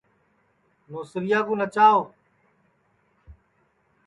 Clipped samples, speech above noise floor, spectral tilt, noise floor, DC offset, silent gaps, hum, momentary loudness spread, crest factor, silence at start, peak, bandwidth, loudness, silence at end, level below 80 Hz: under 0.1%; 45 dB; -6 dB/octave; -67 dBFS; under 0.1%; none; none; 21 LU; 20 dB; 0.9 s; -6 dBFS; 11 kHz; -21 LUFS; 0.75 s; -62 dBFS